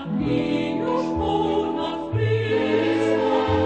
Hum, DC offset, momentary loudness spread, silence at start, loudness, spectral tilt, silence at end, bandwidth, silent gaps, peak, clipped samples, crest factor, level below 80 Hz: none; 0.1%; 4 LU; 0 s; -22 LUFS; -7.5 dB/octave; 0 s; 9 kHz; none; -8 dBFS; under 0.1%; 14 dB; -44 dBFS